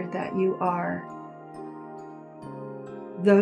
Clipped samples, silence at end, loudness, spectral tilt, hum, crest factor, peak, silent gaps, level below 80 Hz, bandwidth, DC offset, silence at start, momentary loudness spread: under 0.1%; 0 s; -29 LUFS; -8.5 dB/octave; none; 18 dB; -8 dBFS; none; -72 dBFS; 9.8 kHz; under 0.1%; 0 s; 17 LU